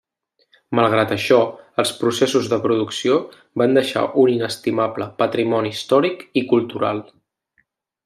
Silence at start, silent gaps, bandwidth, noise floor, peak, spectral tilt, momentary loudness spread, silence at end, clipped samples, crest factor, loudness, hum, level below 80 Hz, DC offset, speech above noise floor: 0.7 s; none; 15 kHz; -67 dBFS; -2 dBFS; -5 dB/octave; 6 LU; 1.05 s; under 0.1%; 18 dB; -19 LUFS; none; -66 dBFS; under 0.1%; 48 dB